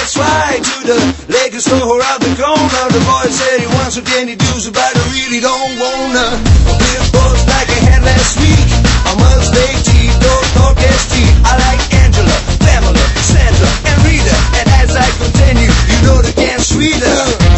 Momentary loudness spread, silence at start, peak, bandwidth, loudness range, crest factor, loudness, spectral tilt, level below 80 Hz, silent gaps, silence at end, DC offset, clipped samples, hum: 4 LU; 0 s; 0 dBFS; 8.4 kHz; 3 LU; 8 dB; -10 LUFS; -4.5 dB/octave; -14 dBFS; none; 0 s; under 0.1%; 0.3%; none